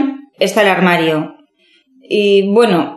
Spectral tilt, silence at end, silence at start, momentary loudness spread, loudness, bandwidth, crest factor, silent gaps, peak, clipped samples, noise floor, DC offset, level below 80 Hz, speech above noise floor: -5.5 dB/octave; 0 s; 0 s; 10 LU; -13 LUFS; 13 kHz; 14 dB; none; 0 dBFS; under 0.1%; -54 dBFS; under 0.1%; -66 dBFS; 42 dB